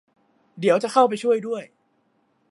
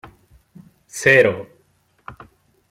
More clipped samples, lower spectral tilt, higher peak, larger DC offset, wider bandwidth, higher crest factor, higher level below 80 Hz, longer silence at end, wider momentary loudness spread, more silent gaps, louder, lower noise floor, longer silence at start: neither; about the same, -5 dB/octave vs -4.5 dB/octave; about the same, -4 dBFS vs -2 dBFS; neither; second, 11.5 kHz vs 16 kHz; about the same, 20 dB vs 20 dB; second, -80 dBFS vs -58 dBFS; first, 0.85 s vs 0.6 s; second, 11 LU vs 27 LU; neither; second, -21 LUFS vs -15 LUFS; first, -67 dBFS vs -61 dBFS; second, 0.55 s vs 0.95 s